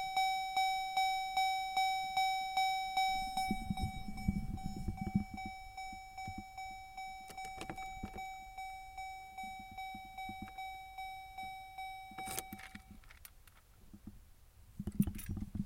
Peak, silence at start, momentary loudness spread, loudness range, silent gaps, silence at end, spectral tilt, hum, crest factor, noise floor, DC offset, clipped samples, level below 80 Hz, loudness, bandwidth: -18 dBFS; 0 s; 13 LU; 13 LU; none; 0 s; -3.5 dB/octave; none; 22 dB; -61 dBFS; under 0.1%; under 0.1%; -52 dBFS; -40 LUFS; 16.5 kHz